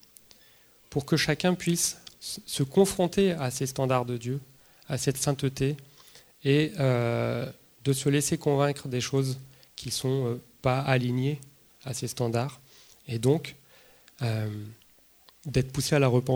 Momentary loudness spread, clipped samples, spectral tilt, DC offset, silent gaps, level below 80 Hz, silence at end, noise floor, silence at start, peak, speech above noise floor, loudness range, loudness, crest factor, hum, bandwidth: 13 LU; under 0.1%; -5 dB/octave; under 0.1%; none; -56 dBFS; 0 s; -59 dBFS; 0.9 s; -6 dBFS; 32 dB; 5 LU; -28 LUFS; 22 dB; none; over 20 kHz